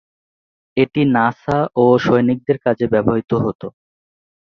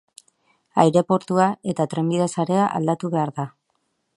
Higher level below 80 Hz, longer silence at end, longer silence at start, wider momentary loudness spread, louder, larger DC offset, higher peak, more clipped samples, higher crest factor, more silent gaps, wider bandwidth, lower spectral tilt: first, -50 dBFS vs -66 dBFS; about the same, 0.7 s vs 0.7 s; about the same, 0.75 s vs 0.75 s; about the same, 9 LU vs 9 LU; first, -17 LUFS vs -21 LUFS; neither; about the same, -2 dBFS vs 0 dBFS; neither; second, 16 dB vs 22 dB; first, 3.55-3.59 s vs none; second, 6.6 kHz vs 11.5 kHz; first, -8.5 dB/octave vs -6.5 dB/octave